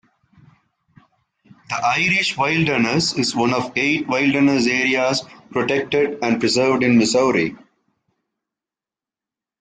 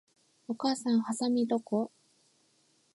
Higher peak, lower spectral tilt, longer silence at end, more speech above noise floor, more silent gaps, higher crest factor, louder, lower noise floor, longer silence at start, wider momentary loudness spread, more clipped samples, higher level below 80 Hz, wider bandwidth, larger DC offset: first, -6 dBFS vs -16 dBFS; about the same, -4.5 dB/octave vs -5 dB/octave; first, 2.05 s vs 1.05 s; first, 72 dB vs 40 dB; neither; about the same, 16 dB vs 16 dB; first, -18 LUFS vs -31 LUFS; first, -90 dBFS vs -70 dBFS; first, 1.7 s vs 0.5 s; second, 6 LU vs 12 LU; neither; first, -58 dBFS vs -86 dBFS; second, 9.6 kHz vs 11.5 kHz; neither